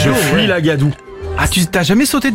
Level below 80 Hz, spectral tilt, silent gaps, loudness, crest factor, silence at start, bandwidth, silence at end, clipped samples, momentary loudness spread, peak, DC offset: -32 dBFS; -4.5 dB/octave; none; -13 LUFS; 12 dB; 0 s; 16.5 kHz; 0 s; under 0.1%; 7 LU; -2 dBFS; under 0.1%